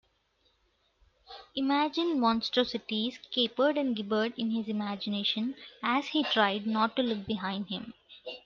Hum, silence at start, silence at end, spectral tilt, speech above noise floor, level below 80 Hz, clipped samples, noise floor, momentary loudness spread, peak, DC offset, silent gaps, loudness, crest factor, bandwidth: none; 1.3 s; 0.05 s; -5.5 dB/octave; 42 dB; -70 dBFS; under 0.1%; -72 dBFS; 11 LU; -12 dBFS; under 0.1%; none; -30 LUFS; 20 dB; 7 kHz